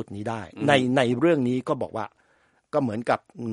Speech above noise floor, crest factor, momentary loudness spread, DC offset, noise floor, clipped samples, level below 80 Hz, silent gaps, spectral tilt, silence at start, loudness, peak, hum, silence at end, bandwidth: 40 dB; 22 dB; 12 LU; under 0.1%; -64 dBFS; under 0.1%; -64 dBFS; none; -6.5 dB/octave; 0 s; -24 LUFS; -2 dBFS; none; 0 s; 11.5 kHz